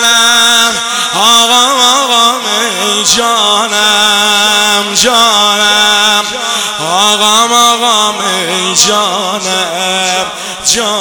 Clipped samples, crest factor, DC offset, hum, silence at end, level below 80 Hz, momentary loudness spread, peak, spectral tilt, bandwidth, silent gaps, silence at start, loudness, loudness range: 0.9%; 10 dB; 0.4%; none; 0 s; -50 dBFS; 7 LU; 0 dBFS; 0 dB/octave; over 20 kHz; none; 0 s; -7 LUFS; 2 LU